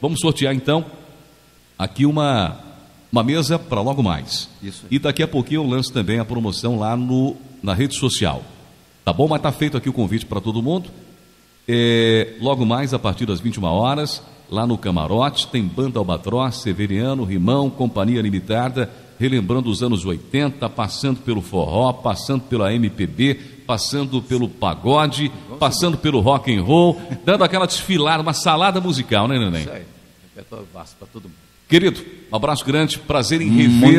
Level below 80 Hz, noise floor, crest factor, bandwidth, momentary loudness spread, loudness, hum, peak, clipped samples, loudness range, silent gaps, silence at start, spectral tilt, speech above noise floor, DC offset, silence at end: -44 dBFS; -51 dBFS; 18 dB; 15 kHz; 10 LU; -19 LUFS; none; 0 dBFS; under 0.1%; 4 LU; none; 0 s; -5.5 dB/octave; 33 dB; under 0.1%; 0 s